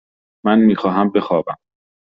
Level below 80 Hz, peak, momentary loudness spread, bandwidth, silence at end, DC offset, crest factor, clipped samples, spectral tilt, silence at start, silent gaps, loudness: -58 dBFS; -2 dBFS; 13 LU; 5.4 kHz; 0.65 s; under 0.1%; 16 dB; under 0.1%; -6 dB/octave; 0.45 s; none; -16 LUFS